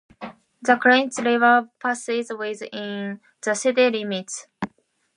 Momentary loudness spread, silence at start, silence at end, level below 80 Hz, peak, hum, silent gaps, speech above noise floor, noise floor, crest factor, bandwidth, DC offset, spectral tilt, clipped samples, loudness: 17 LU; 0.2 s; 0.5 s; -68 dBFS; -2 dBFS; none; none; 38 dB; -59 dBFS; 22 dB; 11.5 kHz; under 0.1%; -3.5 dB/octave; under 0.1%; -21 LUFS